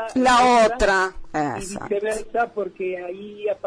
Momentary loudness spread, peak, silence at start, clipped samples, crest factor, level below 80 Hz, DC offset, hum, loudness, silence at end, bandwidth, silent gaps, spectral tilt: 14 LU; -8 dBFS; 0 s; under 0.1%; 12 dB; -42 dBFS; under 0.1%; none; -21 LUFS; 0 s; 10.5 kHz; none; -3.5 dB/octave